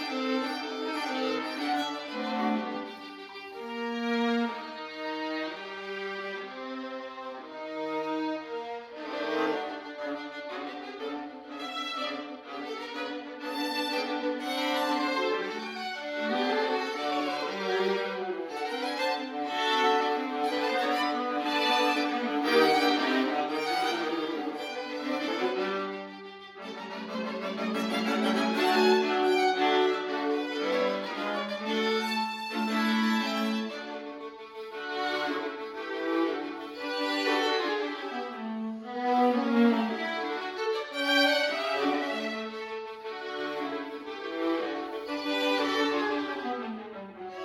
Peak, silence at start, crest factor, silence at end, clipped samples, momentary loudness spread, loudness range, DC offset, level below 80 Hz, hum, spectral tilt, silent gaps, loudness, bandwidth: -12 dBFS; 0 s; 18 dB; 0 s; under 0.1%; 13 LU; 8 LU; under 0.1%; -78 dBFS; none; -4 dB/octave; none; -30 LUFS; 17 kHz